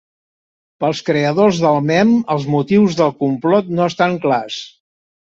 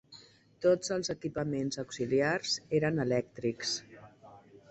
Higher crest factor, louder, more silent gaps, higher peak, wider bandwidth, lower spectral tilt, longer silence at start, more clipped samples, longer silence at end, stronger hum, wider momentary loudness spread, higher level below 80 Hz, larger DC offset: about the same, 14 dB vs 18 dB; first, -15 LUFS vs -32 LUFS; neither; first, -2 dBFS vs -14 dBFS; second, 7.8 kHz vs 8.6 kHz; first, -6.5 dB/octave vs -4.5 dB/octave; first, 0.8 s vs 0.1 s; neither; first, 0.7 s vs 0.3 s; neither; about the same, 7 LU vs 7 LU; first, -56 dBFS vs -66 dBFS; neither